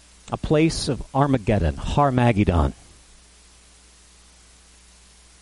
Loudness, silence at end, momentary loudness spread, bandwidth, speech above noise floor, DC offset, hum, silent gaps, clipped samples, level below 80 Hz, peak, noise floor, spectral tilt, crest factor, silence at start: -21 LUFS; 2.7 s; 8 LU; 11.5 kHz; 31 dB; under 0.1%; none; none; under 0.1%; -34 dBFS; -6 dBFS; -51 dBFS; -6.5 dB/octave; 18 dB; 0.25 s